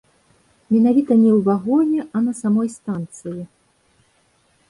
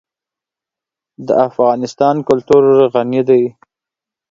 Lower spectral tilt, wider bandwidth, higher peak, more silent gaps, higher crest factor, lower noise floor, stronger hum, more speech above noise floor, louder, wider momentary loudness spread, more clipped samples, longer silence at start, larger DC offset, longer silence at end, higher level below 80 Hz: first, -8.5 dB/octave vs -7 dB/octave; first, 11.5 kHz vs 7.6 kHz; second, -6 dBFS vs 0 dBFS; neither; about the same, 14 dB vs 14 dB; second, -61 dBFS vs -87 dBFS; neither; second, 43 dB vs 75 dB; second, -18 LUFS vs -13 LUFS; first, 17 LU vs 6 LU; neither; second, 0.7 s vs 1.2 s; neither; first, 1.25 s vs 0.8 s; second, -62 dBFS vs -54 dBFS